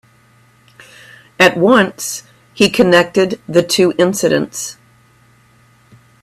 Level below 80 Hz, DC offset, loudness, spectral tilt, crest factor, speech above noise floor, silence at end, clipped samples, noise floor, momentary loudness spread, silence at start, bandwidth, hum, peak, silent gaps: -54 dBFS; under 0.1%; -13 LUFS; -4 dB/octave; 16 dB; 37 dB; 1.5 s; under 0.1%; -50 dBFS; 13 LU; 1.4 s; 16 kHz; none; 0 dBFS; none